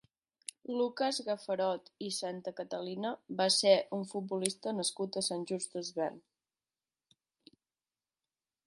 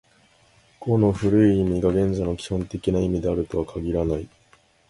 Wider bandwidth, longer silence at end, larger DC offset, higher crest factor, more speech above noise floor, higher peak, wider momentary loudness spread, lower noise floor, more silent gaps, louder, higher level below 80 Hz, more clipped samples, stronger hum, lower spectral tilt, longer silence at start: about the same, 12 kHz vs 11.5 kHz; first, 2.45 s vs 0.6 s; neither; first, 24 dB vs 18 dB; first, over 56 dB vs 37 dB; second, -12 dBFS vs -6 dBFS; about the same, 12 LU vs 10 LU; first, under -90 dBFS vs -58 dBFS; neither; second, -34 LUFS vs -23 LUFS; second, -86 dBFS vs -40 dBFS; neither; neither; second, -3 dB/octave vs -8 dB/octave; about the same, 0.7 s vs 0.8 s